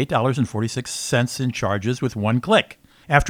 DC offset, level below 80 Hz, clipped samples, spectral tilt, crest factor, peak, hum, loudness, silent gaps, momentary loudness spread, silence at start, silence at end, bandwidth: under 0.1%; -40 dBFS; under 0.1%; -5 dB/octave; 22 dB; 0 dBFS; none; -22 LUFS; none; 7 LU; 0 s; 0 s; 16 kHz